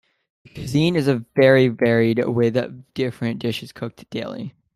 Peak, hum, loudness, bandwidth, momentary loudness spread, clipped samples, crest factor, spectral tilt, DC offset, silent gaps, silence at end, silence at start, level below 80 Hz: -2 dBFS; none; -20 LUFS; 13.5 kHz; 16 LU; under 0.1%; 18 dB; -7 dB/octave; under 0.1%; none; 0.25 s; 0.55 s; -56 dBFS